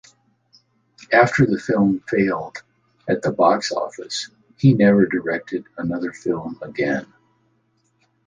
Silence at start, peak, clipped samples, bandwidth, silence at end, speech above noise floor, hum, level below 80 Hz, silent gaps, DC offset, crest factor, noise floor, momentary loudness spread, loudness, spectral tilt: 1 s; -2 dBFS; under 0.1%; 9.6 kHz; 1.25 s; 46 dB; none; -54 dBFS; none; under 0.1%; 20 dB; -65 dBFS; 13 LU; -20 LUFS; -6.5 dB/octave